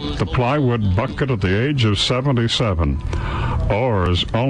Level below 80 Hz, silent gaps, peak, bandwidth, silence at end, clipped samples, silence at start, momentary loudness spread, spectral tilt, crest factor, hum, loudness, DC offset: -28 dBFS; none; -8 dBFS; 10 kHz; 0 s; under 0.1%; 0 s; 5 LU; -6 dB/octave; 10 dB; none; -19 LUFS; under 0.1%